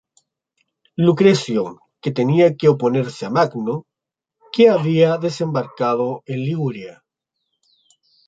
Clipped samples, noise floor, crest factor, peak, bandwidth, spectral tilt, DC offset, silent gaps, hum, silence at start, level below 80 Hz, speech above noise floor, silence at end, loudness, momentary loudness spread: under 0.1%; -85 dBFS; 18 dB; -2 dBFS; 9 kHz; -7 dB/octave; under 0.1%; none; none; 1 s; -64 dBFS; 68 dB; 1.35 s; -18 LUFS; 13 LU